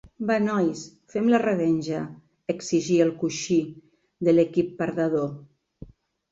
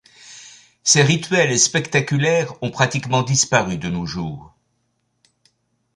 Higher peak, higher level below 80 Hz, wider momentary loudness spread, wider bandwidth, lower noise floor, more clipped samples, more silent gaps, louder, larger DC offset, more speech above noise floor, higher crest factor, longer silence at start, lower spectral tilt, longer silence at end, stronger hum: second, -8 dBFS vs -2 dBFS; second, -62 dBFS vs -52 dBFS; second, 12 LU vs 16 LU; second, 7.8 kHz vs 11.5 kHz; second, -47 dBFS vs -69 dBFS; neither; neither; second, -24 LUFS vs -18 LUFS; neither; second, 24 dB vs 51 dB; about the same, 18 dB vs 18 dB; second, 0.05 s vs 0.25 s; first, -6 dB/octave vs -3.5 dB/octave; second, 0.45 s vs 1.5 s; neither